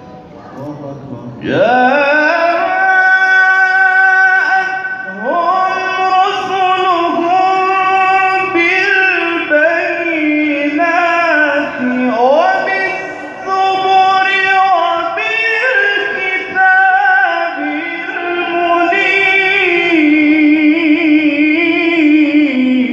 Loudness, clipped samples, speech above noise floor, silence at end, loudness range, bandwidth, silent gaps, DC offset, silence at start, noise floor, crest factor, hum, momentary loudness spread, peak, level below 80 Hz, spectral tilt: -11 LUFS; under 0.1%; 19 dB; 0 s; 3 LU; 7.6 kHz; none; under 0.1%; 0 s; -33 dBFS; 12 dB; none; 9 LU; 0 dBFS; -58 dBFS; -4.5 dB/octave